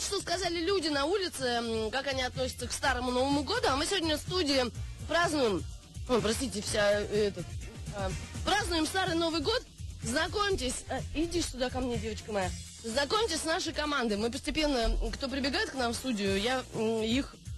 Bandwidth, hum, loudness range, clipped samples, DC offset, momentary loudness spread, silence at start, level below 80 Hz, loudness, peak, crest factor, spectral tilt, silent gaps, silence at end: 12.5 kHz; none; 2 LU; under 0.1%; under 0.1%; 7 LU; 0 s; -44 dBFS; -31 LUFS; -18 dBFS; 14 dB; -3.5 dB/octave; none; 0 s